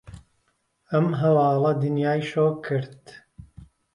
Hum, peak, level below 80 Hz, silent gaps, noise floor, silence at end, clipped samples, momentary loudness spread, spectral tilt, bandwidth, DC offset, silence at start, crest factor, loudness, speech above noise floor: none; -8 dBFS; -58 dBFS; none; -71 dBFS; 0.3 s; under 0.1%; 9 LU; -8.5 dB/octave; 10.5 kHz; under 0.1%; 0.1 s; 16 dB; -23 LUFS; 48 dB